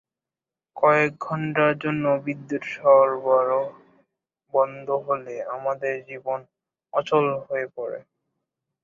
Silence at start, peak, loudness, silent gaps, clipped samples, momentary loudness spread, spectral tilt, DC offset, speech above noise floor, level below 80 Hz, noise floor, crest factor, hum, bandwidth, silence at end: 0.75 s; -4 dBFS; -23 LUFS; none; under 0.1%; 13 LU; -7 dB/octave; under 0.1%; over 67 dB; -70 dBFS; under -90 dBFS; 20 dB; none; 7.2 kHz; 0.85 s